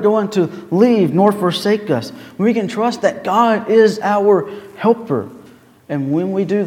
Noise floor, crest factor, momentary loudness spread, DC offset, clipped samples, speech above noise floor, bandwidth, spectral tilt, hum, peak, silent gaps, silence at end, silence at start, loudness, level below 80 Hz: -44 dBFS; 16 dB; 10 LU; under 0.1%; under 0.1%; 28 dB; 15.5 kHz; -6.5 dB/octave; none; 0 dBFS; none; 0 s; 0 s; -16 LUFS; -64 dBFS